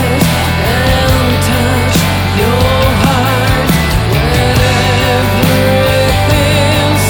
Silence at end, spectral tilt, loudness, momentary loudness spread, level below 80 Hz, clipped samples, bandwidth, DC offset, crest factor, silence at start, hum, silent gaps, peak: 0 s; -5 dB/octave; -10 LUFS; 2 LU; -22 dBFS; under 0.1%; 19.5 kHz; under 0.1%; 10 dB; 0 s; none; none; 0 dBFS